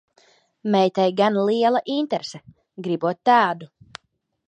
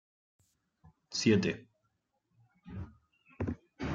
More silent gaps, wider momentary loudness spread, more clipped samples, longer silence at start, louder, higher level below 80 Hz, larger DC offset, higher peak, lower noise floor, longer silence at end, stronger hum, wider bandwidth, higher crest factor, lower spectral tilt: neither; second, 16 LU vs 19 LU; neither; second, 0.65 s vs 1.1 s; first, -21 LUFS vs -33 LUFS; second, -70 dBFS vs -60 dBFS; neither; first, -4 dBFS vs -14 dBFS; second, -70 dBFS vs -80 dBFS; first, 0.85 s vs 0 s; neither; about the same, 9.2 kHz vs 9 kHz; about the same, 18 dB vs 22 dB; about the same, -6 dB/octave vs -5 dB/octave